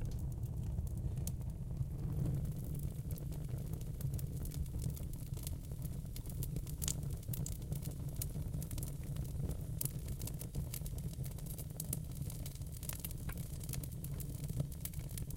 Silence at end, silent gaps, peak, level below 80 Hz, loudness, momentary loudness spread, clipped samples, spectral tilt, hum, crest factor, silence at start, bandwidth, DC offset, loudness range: 0 s; none; -16 dBFS; -46 dBFS; -43 LUFS; 4 LU; under 0.1%; -5.5 dB/octave; none; 24 dB; 0 s; 17 kHz; under 0.1%; 2 LU